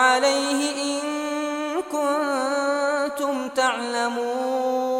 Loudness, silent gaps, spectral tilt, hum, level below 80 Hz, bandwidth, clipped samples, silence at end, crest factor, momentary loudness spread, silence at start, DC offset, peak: -23 LUFS; none; -1 dB/octave; none; -70 dBFS; 16.5 kHz; under 0.1%; 0 s; 20 dB; 5 LU; 0 s; under 0.1%; -4 dBFS